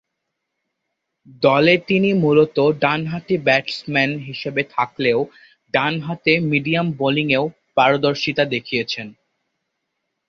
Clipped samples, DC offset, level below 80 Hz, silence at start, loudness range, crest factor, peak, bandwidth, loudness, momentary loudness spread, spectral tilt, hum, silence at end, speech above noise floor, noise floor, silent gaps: under 0.1%; under 0.1%; -60 dBFS; 1.4 s; 3 LU; 18 dB; -2 dBFS; 7.4 kHz; -18 LUFS; 8 LU; -6.5 dB/octave; none; 1.15 s; 59 dB; -78 dBFS; none